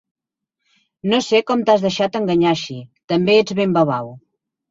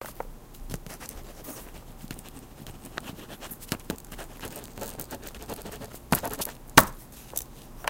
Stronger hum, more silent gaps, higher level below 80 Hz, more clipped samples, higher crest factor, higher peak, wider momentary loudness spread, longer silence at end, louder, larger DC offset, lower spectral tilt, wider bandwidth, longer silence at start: neither; first, 3.04-3.08 s vs none; second, -58 dBFS vs -46 dBFS; neither; second, 16 dB vs 32 dB; about the same, -2 dBFS vs 0 dBFS; second, 12 LU vs 19 LU; first, 0.55 s vs 0 s; first, -17 LUFS vs -30 LUFS; neither; first, -5.5 dB/octave vs -3 dB/octave; second, 7.8 kHz vs 16.5 kHz; first, 1.05 s vs 0 s